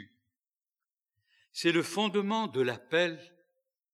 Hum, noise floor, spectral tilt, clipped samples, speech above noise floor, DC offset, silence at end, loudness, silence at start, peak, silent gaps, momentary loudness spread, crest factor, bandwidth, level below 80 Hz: none; under -90 dBFS; -4.5 dB/octave; under 0.1%; over 60 dB; under 0.1%; 0.7 s; -30 LUFS; 0 s; -14 dBFS; 0.39-0.44 s, 0.56-0.62 s, 0.93-0.97 s; 6 LU; 20 dB; 14 kHz; under -90 dBFS